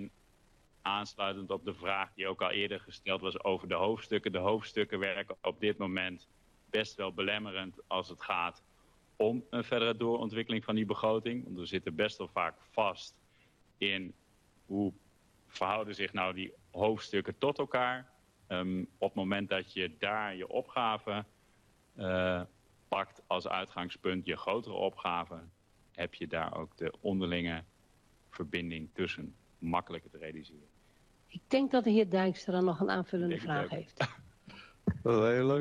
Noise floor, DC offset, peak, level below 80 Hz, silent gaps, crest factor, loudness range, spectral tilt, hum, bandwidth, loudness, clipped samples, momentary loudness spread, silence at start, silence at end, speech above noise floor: -67 dBFS; under 0.1%; -16 dBFS; -66 dBFS; none; 18 dB; 5 LU; -6 dB/octave; none; 12 kHz; -35 LUFS; under 0.1%; 10 LU; 0 s; 0 s; 33 dB